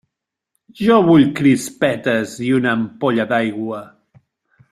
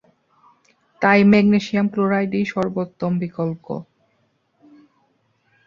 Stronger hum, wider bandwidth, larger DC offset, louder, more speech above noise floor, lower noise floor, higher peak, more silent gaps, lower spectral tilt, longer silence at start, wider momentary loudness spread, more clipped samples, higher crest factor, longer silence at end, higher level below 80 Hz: neither; first, 14 kHz vs 7 kHz; neither; first, -16 LUFS vs -19 LUFS; first, 65 dB vs 47 dB; first, -80 dBFS vs -65 dBFS; about the same, -2 dBFS vs -2 dBFS; neither; second, -6 dB/octave vs -7.5 dB/octave; second, 0.8 s vs 1 s; second, 10 LU vs 13 LU; neither; about the same, 16 dB vs 20 dB; second, 0.85 s vs 1.85 s; about the same, -56 dBFS vs -58 dBFS